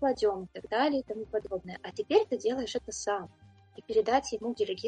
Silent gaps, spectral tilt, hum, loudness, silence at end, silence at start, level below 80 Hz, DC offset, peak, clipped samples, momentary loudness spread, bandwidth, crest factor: none; -3.5 dB/octave; none; -31 LUFS; 0 s; 0 s; -62 dBFS; under 0.1%; -12 dBFS; under 0.1%; 11 LU; 9.4 kHz; 20 dB